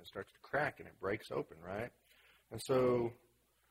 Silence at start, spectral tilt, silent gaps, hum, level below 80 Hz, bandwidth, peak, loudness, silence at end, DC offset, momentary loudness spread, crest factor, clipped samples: 0 s; -6 dB/octave; none; none; -68 dBFS; 16 kHz; -22 dBFS; -39 LUFS; 0.55 s; under 0.1%; 16 LU; 18 dB; under 0.1%